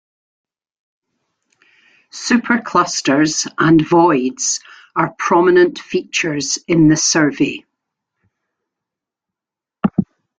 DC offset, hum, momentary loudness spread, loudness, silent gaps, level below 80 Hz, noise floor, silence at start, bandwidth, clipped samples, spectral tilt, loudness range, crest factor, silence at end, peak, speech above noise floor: under 0.1%; none; 11 LU; -15 LUFS; none; -54 dBFS; -87 dBFS; 2.15 s; 9.4 kHz; under 0.1%; -4 dB/octave; 5 LU; 16 dB; 0.35 s; -2 dBFS; 72 dB